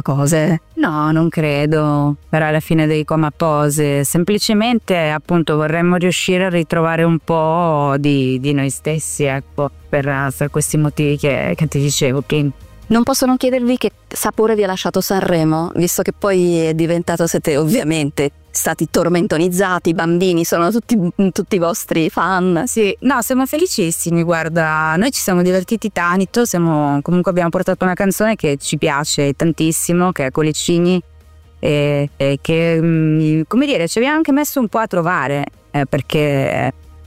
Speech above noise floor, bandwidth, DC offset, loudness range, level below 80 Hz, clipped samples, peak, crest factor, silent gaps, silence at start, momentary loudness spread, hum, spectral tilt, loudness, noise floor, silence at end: 28 dB; 16 kHz; under 0.1%; 1 LU; -44 dBFS; under 0.1%; -4 dBFS; 10 dB; none; 0.05 s; 4 LU; none; -5.5 dB/octave; -16 LUFS; -43 dBFS; 0 s